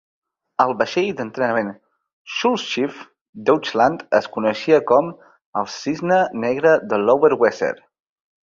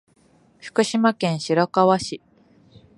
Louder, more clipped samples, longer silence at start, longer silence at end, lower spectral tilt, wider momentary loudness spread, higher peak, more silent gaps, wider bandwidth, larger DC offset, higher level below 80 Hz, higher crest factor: about the same, -19 LUFS vs -21 LUFS; neither; about the same, 0.6 s vs 0.65 s; about the same, 0.7 s vs 0.8 s; about the same, -5 dB/octave vs -5.5 dB/octave; second, 11 LU vs 15 LU; about the same, -2 dBFS vs -4 dBFS; first, 2.13-2.25 s, 3.21-3.33 s, 5.46-5.53 s vs none; second, 7.4 kHz vs 11.5 kHz; neither; about the same, -62 dBFS vs -62 dBFS; about the same, 18 dB vs 20 dB